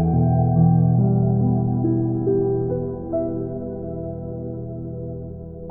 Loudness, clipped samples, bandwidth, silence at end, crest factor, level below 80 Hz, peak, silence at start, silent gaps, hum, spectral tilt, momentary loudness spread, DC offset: -21 LUFS; under 0.1%; 1.7 kHz; 0 s; 14 dB; -40 dBFS; -6 dBFS; 0 s; none; none; -17.5 dB/octave; 14 LU; under 0.1%